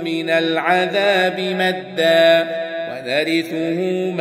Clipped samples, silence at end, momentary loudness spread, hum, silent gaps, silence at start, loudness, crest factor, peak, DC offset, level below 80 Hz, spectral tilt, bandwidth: under 0.1%; 0 s; 9 LU; none; none; 0 s; -17 LUFS; 16 dB; -2 dBFS; under 0.1%; -70 dBFS; -5 dB/octave; 16 kHz